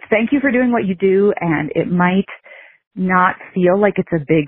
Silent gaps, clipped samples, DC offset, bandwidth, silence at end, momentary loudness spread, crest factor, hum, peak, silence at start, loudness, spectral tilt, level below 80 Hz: 2.87-2.91 s; under 0.1%; under 0.1%; 3.8 kHz; 0 s; 7 LU; 14 dB; none; -2 dBFS; 0.1 s; -16 LUFS; -6 dB/octave; -50 dBFS